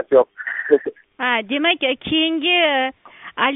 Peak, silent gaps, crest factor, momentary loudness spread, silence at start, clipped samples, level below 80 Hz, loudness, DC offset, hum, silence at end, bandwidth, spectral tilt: 0 dBFS; none; 18 dB; 10 LU; 0 s; under 0.1%; -60 dBFS; -18 LUFS; under 0.1%; none; 0 s; 4 kHz; 0 dB/octave